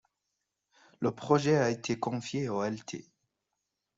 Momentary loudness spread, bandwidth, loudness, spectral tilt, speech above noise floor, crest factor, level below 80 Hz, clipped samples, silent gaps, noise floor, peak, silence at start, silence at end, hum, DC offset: 13 LU; 7.8 kHz; -31 LUFS; -6 dB/octave; 55 dB; 22 dB; -70 dBFS; under 0.1%; none; -85 dBFS; -10 dBFS; 1 s; 0.95 s; none; under 0.1%